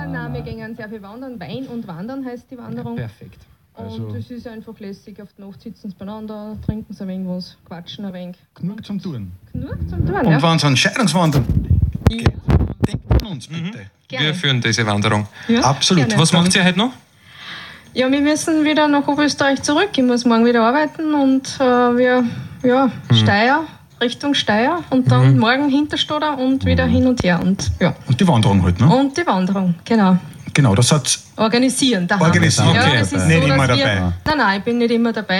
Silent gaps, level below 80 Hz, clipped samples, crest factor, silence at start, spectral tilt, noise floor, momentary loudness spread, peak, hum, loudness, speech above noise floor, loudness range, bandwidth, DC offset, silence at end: none; -34 dBFS; under 0.1%; 16 dB; 0 s; -5 dB/octave; -38 dBFS; 18 LU; 0 dBFS; none; -16 LUFS; 21 dB; 15 LU; 15.5 kHz; under 0.1%; 0 s